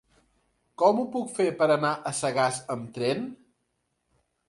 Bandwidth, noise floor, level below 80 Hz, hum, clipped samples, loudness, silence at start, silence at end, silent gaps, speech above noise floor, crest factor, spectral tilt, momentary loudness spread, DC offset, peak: 11.5 kHz; -77 dBFS; -70 dBFS; none; under 0.1%; -26 LUFS; 0.8 s; 1.15 s; none; 51 dB; 22 dB; -4.5 dB/octave; 10 LU; under 0.1%; -8 dBFS